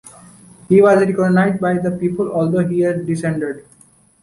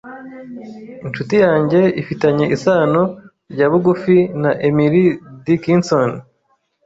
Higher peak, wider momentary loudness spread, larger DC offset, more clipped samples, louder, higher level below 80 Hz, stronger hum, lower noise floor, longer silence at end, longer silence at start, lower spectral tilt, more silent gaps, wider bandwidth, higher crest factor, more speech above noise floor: about the same, -2 dBFS vs -2 dBFS; second, 9 LU vs 20 LU; neither; neither; about the same, -16 LUFS vs -15 LUFS; about the same, -54 dBFS vs -54 dBFS; neither; second, -51 dBFS vs -64 dBFS; about the same, 0.6 s vs 0.65 s; about the same, 0.05 s vs 0.05 s; about the same, -8 dB/octave vs -7.5 dB/octave; neither; first, 11.5 kHz vs 7.8 kHz; about the same, 14 dB vs 14 dB; second, 35 dB vs 48 dB